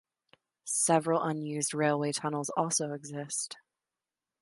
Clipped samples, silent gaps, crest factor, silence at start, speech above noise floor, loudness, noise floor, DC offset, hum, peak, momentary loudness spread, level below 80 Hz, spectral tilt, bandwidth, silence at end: under 0.1%; none; 22 dB; 0.65 s; over 59 dB; -31 LUFS; under -90 dBFS; under 0.1%; none; -12 dBFS; 13 LU; -80 dBFS; -4 dB/octave; 12 kHz; 0.85 s